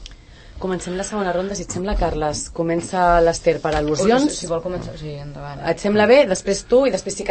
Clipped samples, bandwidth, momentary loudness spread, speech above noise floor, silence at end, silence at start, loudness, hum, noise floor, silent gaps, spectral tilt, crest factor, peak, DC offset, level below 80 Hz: under 0.1%; 8.8 kHz; 14 LU; 22 dB; 0 s; 0 s; -19 LUFS; none; -41 dBFS; none; -4.5 dB/octave; 18 dB; -2 dBFS; under 0.1%; -34 dBFS